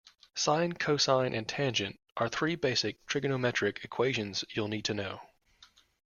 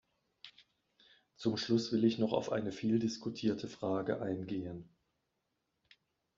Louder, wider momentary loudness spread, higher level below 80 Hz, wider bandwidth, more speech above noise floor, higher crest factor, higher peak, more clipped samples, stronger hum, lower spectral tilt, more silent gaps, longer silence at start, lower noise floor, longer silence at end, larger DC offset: first, -31 LUFS vs -35 LUFS; second, 7 LU vs 19 LU; first, -66 dBFS vs -74 dBFS; first, 11 kHz vs 7.6 kHz; second, 31 dB vs 50 dB; about the same, 20 dB vs 20 dB; first, -12 dBFS vs -18 dBFS; neither; neither; second, -4 dB/octave vs -5.5 dB/octave; first, 2.12-2.16 s vs none; about the same, 0.35 s vs 0.45 s; second, -62 dBFS vs -84 dBFS; second, 0.45 s vs 1.55 s; neither